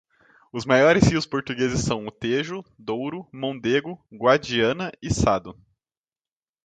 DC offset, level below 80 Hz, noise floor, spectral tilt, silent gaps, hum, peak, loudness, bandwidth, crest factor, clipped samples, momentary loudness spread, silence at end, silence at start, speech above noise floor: under 0.1%; -44 dBFS; under -90 dBFS; -5 dB/octave; none; none; -2 dBFS; -23 LUFS; 9.4 kHz; 22 dB; under 0.1%; 14 LU; 1.15 s; 0.55 s; over 67 dB